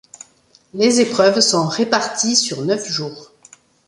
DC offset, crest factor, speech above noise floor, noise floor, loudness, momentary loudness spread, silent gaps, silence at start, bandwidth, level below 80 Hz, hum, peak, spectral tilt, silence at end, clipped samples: under 0.1%; 18 dB; 37 dB; -54 dBFS; -16 LUFS; 10 LU; none; 0.75 s; 11.5 kHz; -62 dBFS; none; 0 dBFS; -3 dB/octave; 0.65 s; under 0.1%